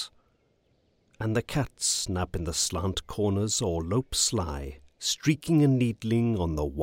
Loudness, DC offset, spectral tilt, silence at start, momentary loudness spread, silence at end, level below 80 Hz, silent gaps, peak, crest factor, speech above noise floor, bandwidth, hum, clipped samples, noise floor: -27 LUFS; under 0.1%; -4.5 dB/octave; 0 s; 8 LU; 0 s; -44 dBFS; none; -10 dBFS; 18 dB; 41 dB; 16.5 kHz; none; under 0.1%; -68 dBFS